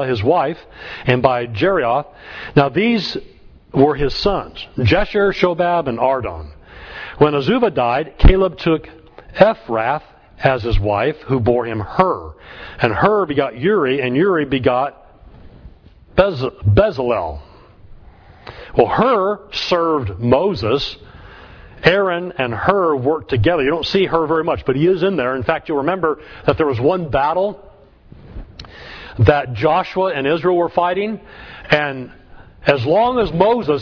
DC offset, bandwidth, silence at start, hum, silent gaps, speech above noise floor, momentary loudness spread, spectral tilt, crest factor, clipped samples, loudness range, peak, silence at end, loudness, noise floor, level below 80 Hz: under 0.1%; 5.4 kHz; 0 s; none; none; 28 dB; 15 LU; -7.5 dB/octave; 18 dB; under 0.1%; 3 LU; 0 dBFS; 0 s; -17 LUFS; -44 dBFS; -30 dBFS